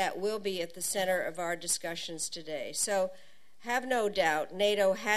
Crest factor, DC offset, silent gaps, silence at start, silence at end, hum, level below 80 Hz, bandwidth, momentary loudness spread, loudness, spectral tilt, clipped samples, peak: 18 dB; 0.4%; none; 0 s; 0 s; none; -68 dBFS; 14 kHz; 8 LU; -31 LUFS; -2 dB/octave; under 0.1%; -14 dBFS